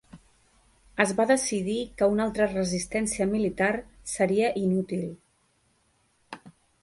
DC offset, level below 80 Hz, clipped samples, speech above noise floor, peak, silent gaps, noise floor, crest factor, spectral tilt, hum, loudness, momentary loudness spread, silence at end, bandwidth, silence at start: under 0.1%; -54 dBFS; under 0.1%; 42 dB; -6 dBFS; none; -68 dBFS; 22 dB; -4.5 dB/octave; none; -26 LUFS; 15 LU; 0.35 s; 11.5 kHz; 0.15 s